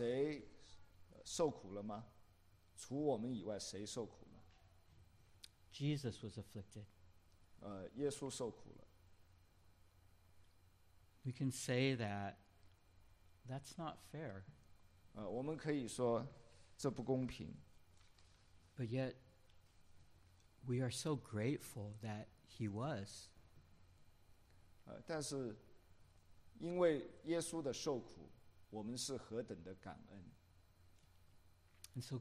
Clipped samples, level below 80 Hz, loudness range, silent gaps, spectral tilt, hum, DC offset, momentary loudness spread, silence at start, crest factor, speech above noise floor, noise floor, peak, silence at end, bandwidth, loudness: under 0.1%; -72 dBFS; 8 LU; none; -5.5 dB/octave; none; under 0.1%; 22 LU; 0 s; 24 dB; 26 dB; -70 dBFS; -24 dBFS; 0 s; 14.5 kHz; -45 LUFS